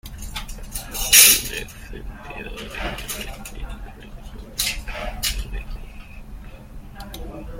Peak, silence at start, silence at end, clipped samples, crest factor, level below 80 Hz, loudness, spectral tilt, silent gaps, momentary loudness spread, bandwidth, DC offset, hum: 0 dBFS; 0.05 s; 0 s; under 0.1%; 24 dB; -34 dBFS; -17 LUFS; -0.5 dB/octave; none; 28 LU; 17 kHz; under 0.1%; none